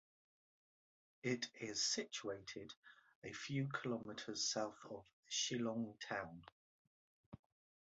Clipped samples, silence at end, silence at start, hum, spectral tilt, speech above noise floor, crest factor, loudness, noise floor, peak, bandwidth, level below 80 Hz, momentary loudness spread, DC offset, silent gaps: under 0.1%; 0.45 s; 1.25 s; none; -3 dB/octave; over 45 dB; 20 dB; -43 LUFS; under -90 dBFS; -28 dBFS; 8 kHz; -80 dBFS; 19 LU; under 0.1%; 2.77-2.83 s, 3.15-3.22 s, 5.13-5.23 s, 6.52-7.32 s